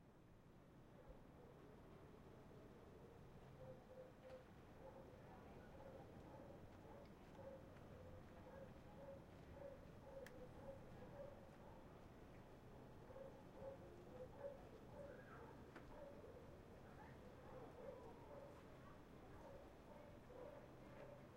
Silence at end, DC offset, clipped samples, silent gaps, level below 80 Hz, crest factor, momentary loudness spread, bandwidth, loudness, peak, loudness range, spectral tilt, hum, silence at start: 0 s; under 0.1%; under 0.1%; none; -70 dBFS; 18 dB; 5 LU; 16 kHz; -62 LUFS; -42 dBFS; 3 LU; -7 dB/octave; none; 0 s